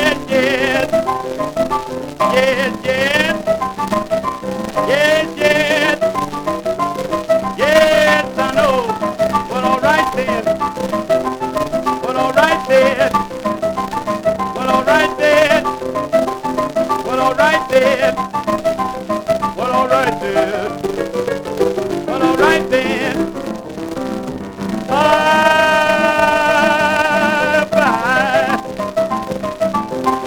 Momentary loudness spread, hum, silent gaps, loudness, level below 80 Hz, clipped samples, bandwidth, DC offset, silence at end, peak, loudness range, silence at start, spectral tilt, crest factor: 9 LU; none; none; -15 LUFS; -44 dBFS; under 0.1%; over 20 kHz; under 0.1%; 0 s; 0 dBFS; 4 LU; 0 s; -4.5 dB/octave; 16 dB